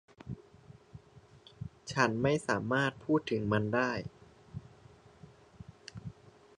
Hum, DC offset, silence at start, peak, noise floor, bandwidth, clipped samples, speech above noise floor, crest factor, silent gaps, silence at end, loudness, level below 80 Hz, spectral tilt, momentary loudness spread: none; under 0.1%; 0.25 s; -12 dBFS; -58 dBFS; 11 kHz; under 0.1%; 27 dB; 24 dB; none; 0.45 s; -32 LUFS; -62 dBFS; -6 dB/octave; 20 LU